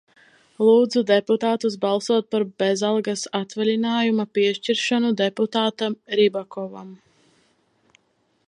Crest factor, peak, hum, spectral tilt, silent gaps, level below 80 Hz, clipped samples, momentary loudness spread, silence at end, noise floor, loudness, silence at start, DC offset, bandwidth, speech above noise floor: 16 dB; -6 dBFS; none; -4.5 dB/octave; none; -76 dBFS; under 0.1%; 9 LU; 1.55 s; -67 dBFS; -21 LUFS; 0.6 s; under 0.1%; 11 kHz; 46 dB